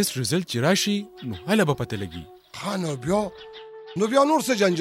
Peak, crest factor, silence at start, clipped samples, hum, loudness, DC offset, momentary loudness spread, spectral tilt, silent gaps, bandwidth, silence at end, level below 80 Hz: -6 dBFS; 18 dB; 0 s; under 0.1%; none; -24 LUFS; under 0.1%; 18 LU; -4.5 dB/octave; none; 16.5 kHz; 0 s; -56 dBFS